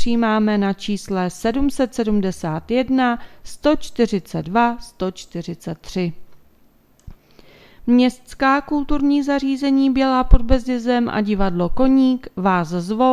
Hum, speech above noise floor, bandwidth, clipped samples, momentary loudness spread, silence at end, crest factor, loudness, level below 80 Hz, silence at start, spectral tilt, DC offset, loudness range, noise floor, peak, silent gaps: none; 36 dB; 14 kHz; under 0.1%; 10 LU; 0 s; 18 dB; -19 LUFS; -28 dBFS; 0 s; -6.5 dB/octave; under 0.1%; 6 LU; -54 dBFS; 0 dBFS; none